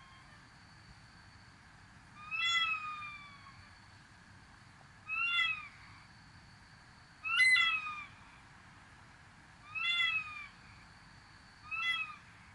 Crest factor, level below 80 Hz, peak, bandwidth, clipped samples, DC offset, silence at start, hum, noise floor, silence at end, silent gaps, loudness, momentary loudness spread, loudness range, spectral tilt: 20 dB; -70 dBFS; -20 dBFS; 11.5 kHz; under 0.1%; under 0.1%; 0 s; none; -58 dBFS; 0 s; none; -32 LUFS; 28 LU; 6 LU; 0 dB/octave